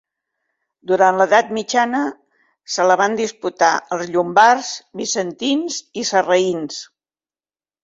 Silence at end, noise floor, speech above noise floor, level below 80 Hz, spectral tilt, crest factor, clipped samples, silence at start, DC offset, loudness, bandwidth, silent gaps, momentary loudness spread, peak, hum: 1 s; under -90 dBFS; over 73 dB; -66 dBFS; -3 dB/octave; 18 dB; under 0.1%; 0.85 s; under 0.1%; -17 LUFS; 8 kHz; none; 13 LU; 0 dBFS; none